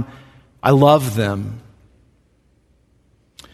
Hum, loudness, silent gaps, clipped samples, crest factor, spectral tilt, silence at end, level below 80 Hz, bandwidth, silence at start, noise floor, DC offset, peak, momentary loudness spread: none; -16 LUFS; none; under 0.1%; 20 dB; -6.5 dB/octave; 1.95 s; -52 dBFS; 14 kHz; 0 s; -59 dBFS; under 0.1%; 0 dBFS; 20 LU